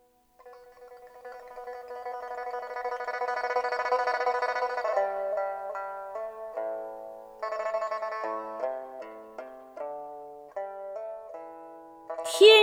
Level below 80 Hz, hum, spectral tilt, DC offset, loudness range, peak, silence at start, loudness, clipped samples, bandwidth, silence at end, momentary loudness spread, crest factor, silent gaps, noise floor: -72 dBFS; none; -0.5 dB/octave; under 0.1%; 9 LU; -6 dBFS; 0.45 s; -30 LUFS; under 0.1%; 16 kHz; 0 s; 17 LU; 24 dB; none; -56 dBFS